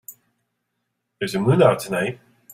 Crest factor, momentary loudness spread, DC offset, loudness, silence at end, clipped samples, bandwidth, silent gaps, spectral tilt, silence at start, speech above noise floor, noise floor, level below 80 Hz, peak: 20 dB; 14 LU; under 0.1%; -20 LUFS; 0.4 s; under 0.1%; 16 kHz; none; -6.5 dB/octave; 0.1 s; 57 dB; -76 dBFS; -58 dBFS; -2 dBFS